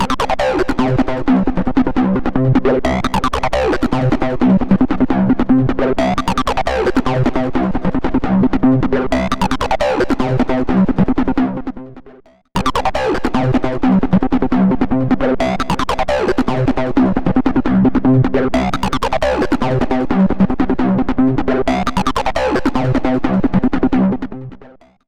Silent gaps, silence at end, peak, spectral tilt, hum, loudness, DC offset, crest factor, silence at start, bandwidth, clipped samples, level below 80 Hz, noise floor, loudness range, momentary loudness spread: none; 0.4 s; -2 dBFS; -7 dB/octave; none; -16 LUFS; under 0.1%; 12 dB; 0 s; 11.5 kHz; under 0.1%; -28 dBFS; -43 dBFS; 2 LU; 4 LU